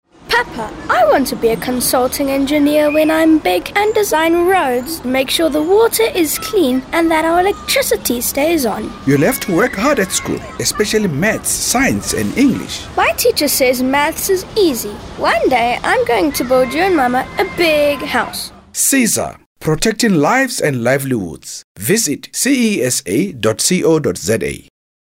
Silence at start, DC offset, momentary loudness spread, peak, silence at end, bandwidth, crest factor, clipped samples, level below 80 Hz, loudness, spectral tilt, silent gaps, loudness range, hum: 0.25 s; under 0.1%; 7 LU; -2 dBFS; 0.45 s; 16.5 kHz; 14 dB; under 0.1%; -40 dBFS; -14 LUFS; -3.5 dB/octave; 19.46-19.56 s, 21.64-21.75 s; 2 LU; none